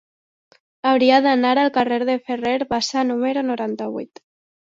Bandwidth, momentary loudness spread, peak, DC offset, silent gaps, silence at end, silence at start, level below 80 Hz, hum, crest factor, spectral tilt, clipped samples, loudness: 7.8 kHz; 12 LU; -2 dBFS; under 0.1%; none; 0.65 s; 0.85 s; -60 dBFS; none; 18 dB; -4 dB/octave; under 0.1%; -19 LUFS